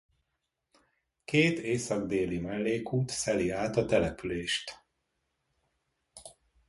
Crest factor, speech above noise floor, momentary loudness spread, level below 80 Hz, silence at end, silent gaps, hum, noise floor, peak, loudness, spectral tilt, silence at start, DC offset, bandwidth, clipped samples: 20 dB; 53 dB; 18 LU; -56 dBFS; 0.35 s; none; none; -83 dBFS; -12 dBFS; -30 LUFS; -5 dB/octave; 1.3 s; under 0.1%; 11.5 kHz; under 0.1%